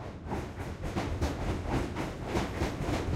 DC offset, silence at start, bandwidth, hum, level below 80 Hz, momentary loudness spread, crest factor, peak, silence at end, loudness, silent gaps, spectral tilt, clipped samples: under 0.1%; 0 s; 15.5 kHz; none; -40 dBFS; 6 LU; 18 dB; -14 dBFS; 0 s; -35 LUFS; none; -6 dB/octave; under 0.1%